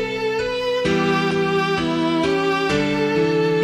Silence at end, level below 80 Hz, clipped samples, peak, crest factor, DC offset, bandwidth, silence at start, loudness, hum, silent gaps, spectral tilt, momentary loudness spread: 0 s; -46 dBFS; under 0.1%; -8 dBFS; 12 dB; under 0.1%; 14.5 kHz; 0 s; -20 LUFS; none; none; -5.5 dB/octave; 3 LU